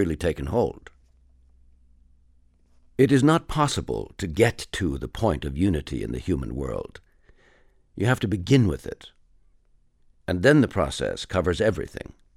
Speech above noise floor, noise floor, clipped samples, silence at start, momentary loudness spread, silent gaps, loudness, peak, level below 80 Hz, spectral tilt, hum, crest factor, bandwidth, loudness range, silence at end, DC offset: 37 dB; -60 dBFS; under 0.1%; 0 s; 16 LU; none; -24 LUFS; -4 dBFS; -42 dBFS; -6 dB/octave; none; 22 dB; 15.5 kHz; 5 LU; 0.35 s; under 0.1%